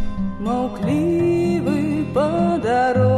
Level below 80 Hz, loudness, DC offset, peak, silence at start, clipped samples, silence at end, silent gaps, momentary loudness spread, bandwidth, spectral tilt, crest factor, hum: -38 dBFS; -20 LUFS; under 0.1%; -8 dBFS; 0 s; under 0.1%; 0 s; none; 5 LU; 12.5 kHz; -8 dB/octave; 12 dB; none